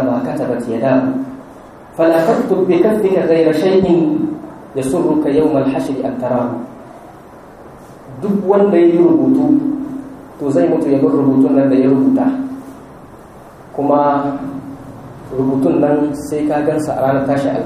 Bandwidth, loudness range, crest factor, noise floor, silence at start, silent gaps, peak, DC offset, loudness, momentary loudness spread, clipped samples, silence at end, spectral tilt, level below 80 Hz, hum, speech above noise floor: 13.5 kHz; 5 LU; 14 dB; -37 dBFS; 0 s; none; 0 dBFS; under 0.1%; -14 LUFS; 17 LU; under 0.1%; 0 s; -8 dB/octave; -48 dBFS; none; 24 dB